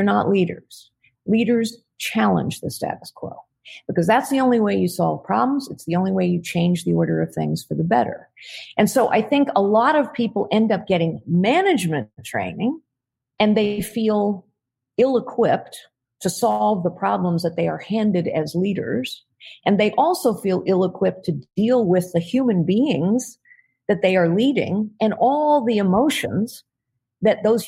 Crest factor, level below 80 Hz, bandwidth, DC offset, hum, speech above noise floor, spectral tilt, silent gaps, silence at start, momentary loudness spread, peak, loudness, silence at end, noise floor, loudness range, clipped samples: 18 dB; -60 dBFS; 16 kHz; under 0.1%; none; 63 dB; -6 dB/octave; none; 0 s; 10 LU; -2 dBFS; -20 LUFS; 0 s; -83 dBFS; 3 LU; under 0.1%